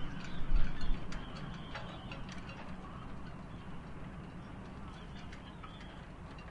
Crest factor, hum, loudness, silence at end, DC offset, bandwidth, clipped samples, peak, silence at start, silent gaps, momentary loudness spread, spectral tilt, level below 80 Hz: 20 dB; none; -46 LUFS; 0 s; under 0.1%; 7.2 kHz; under 0.1%; -16 dBFS; 0 s; none; 9 LU; -6 dB/octave; -40 dBFS